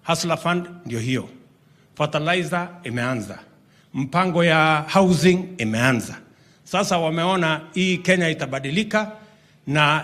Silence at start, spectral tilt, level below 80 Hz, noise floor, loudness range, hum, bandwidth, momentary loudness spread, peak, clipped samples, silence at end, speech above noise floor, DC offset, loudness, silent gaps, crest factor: 0.05 s; -5 dB/octave; -58 dBFS; -55 dBFS; 6 LU; none; 14.5 kHz; 13 LU; -2 dBFS; under 0.1%; 0 s; 34 dB; under 0.1%; -21 LUFS; none; 20 dB